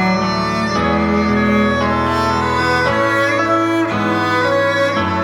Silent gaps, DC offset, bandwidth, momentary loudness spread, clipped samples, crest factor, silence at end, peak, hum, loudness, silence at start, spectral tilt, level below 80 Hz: none; under 0.1%; 16.5 kHz; 2 LU; under 0.1%; 12 dB; 0 s; -4 dBFS; none; -15 LUFS; 0 s; -5.5 dB/octave; -40 dBFS